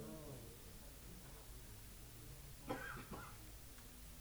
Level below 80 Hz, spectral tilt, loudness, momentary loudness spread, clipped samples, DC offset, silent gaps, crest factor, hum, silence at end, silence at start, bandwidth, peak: -60 dBFS; -4 dB/octave; -54 LUFS; 8 LU; under 0.1%; under 0.1%; none; 24 dB; none; 0 s; 0 s; over 20 kHz; -30 dBFS